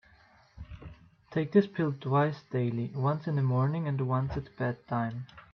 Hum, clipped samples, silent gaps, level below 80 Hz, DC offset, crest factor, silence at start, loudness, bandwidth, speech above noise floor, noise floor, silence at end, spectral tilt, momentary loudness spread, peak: none; under 0.1%; none; -56 dBFS; under 0.1%; 20 dB; 0.55 s; -30 LUFS; 6 kHz; 32 dB; -61 dBFS; 0.1 s; -10 dB/octave; 20 LU; -10 dBFS